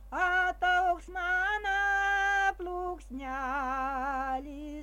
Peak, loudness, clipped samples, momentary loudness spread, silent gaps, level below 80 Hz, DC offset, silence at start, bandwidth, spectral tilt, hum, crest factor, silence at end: -16 dBFS; -30 LUFS; under 0.1%; 10 LU; none; -48 dBFS; under 0.1%; 0 s; 16 kHz; -3.5 dB/octave; none; 16 dB; 0 s